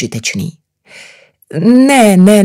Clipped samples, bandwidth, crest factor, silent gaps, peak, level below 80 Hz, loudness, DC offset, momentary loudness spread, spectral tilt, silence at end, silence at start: 0.9%; 16 kHz; 10 dB; none; 0 dBFS; -54 dBFS; -9 LUFS; under 0.1%; 17 LU; -5.5 dB/octave; 0 s; 0 s